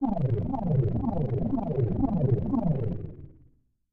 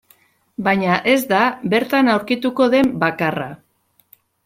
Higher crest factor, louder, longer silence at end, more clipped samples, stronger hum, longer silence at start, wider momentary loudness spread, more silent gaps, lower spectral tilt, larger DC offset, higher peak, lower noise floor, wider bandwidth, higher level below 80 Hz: about the same, 14 dB vs 16 dB; second, -28 LUFS vs -17 LUFS; second, 0.6 s vs 0.9 s; neither; neither; second, 0 s vs 0.6 s; about the same, 7 LU vs 8 LU; neither; first, -13 dB/octave vs -5.5 dB/octave; neither; second, -12 dBFS vs -2 dBFS; about the same, -62 dBFS vs -61 dBFS; second, 3.6 kHz vs 16.5 kHz; first, -40 dBFS vs -58 dBFS